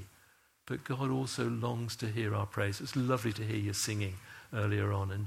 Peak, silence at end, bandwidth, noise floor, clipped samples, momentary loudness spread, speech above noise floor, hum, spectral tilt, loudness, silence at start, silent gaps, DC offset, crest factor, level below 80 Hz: -16 dBFS; 0 s; 16 kHz; -66 dBFS; under 0.1%; 8 LU; 32 dB; none; -5.5 dB/octave; -35 LUFS; 0 s; none; under 0.1%; 18 dB; -66 dBFS